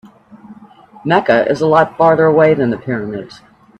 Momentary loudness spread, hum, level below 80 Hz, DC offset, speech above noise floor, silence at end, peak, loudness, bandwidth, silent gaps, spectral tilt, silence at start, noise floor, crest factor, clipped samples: 14 LU; none; -54 dBFS; under 0.1%; 28 dB; 0.45 s; 0 dBFS; -13 LUFS; 8.6 kHz; none; -7.5 dB/octave; 0.5 s; -41 dBFS; 14 dB; under 0.1%